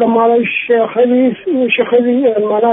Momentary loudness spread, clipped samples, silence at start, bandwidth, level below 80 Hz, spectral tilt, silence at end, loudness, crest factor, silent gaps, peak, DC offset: 2 LU; under 0.1%; 0 s; 3.9 kHz; -64 dBFS; -9.5 dB/octave; 0 s; -12 LUFS; 12 dB; none; 0 dBFS; under 0.1%